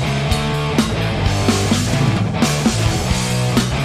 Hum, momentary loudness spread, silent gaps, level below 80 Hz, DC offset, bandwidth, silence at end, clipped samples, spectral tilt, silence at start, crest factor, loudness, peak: none; 2 LU; none; -28 dBFS; under 0.1%; 15.5 kHz; 0 s; under 0.1%; -5 dB/octave; 0 s; 12 dB; -17 LUFS; -4 dBFS